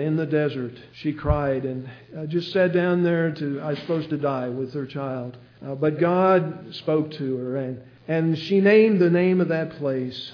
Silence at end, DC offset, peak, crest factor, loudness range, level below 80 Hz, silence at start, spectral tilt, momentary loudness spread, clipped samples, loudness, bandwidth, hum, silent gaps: 0 s; under 0.1%; -6 dBFS; 16 dB; 4 LU; -44 dBFS; 0 s; -9 dB/octave; 15 LU; under 0.1%; -23 LUFS; 5.4 kHz; none; none